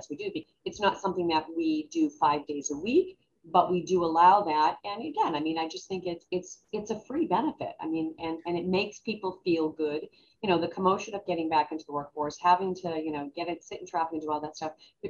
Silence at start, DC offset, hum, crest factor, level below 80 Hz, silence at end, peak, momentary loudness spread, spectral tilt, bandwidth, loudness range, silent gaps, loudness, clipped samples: 0 s; under 0.1%; none; 20 dB; -66 dBFS; 0 s; -8 dBFS; 11 LU; -5 dB/octave; 7.4 kHz; 6 LU; none; -29 LUFS; under 0.1%